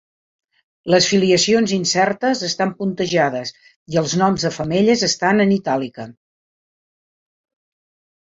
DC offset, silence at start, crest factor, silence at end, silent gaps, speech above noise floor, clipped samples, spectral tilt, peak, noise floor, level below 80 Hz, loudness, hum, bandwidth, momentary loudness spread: under 0.1%; 0.85 s; 18 dB; 2.15 s; 3.76-3.86 s; over 72 dB; under 0.1%; -4 dB/octave; -2 dBFS; under -90 dBFS; -56 dBFS; -17 LUFS; none; 7.8 kHz; 11 LU